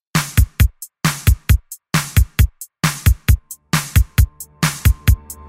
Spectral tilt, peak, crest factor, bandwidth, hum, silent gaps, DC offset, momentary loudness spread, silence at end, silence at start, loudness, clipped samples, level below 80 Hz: -4.5 dB/octave; -2 dBFS; 14 dB; 16.5 kHz; none; none; under 0.1%; 5 LU; 0.15 s; 0.15 s; -18 LUFS; under 0.1%; -20 dBFS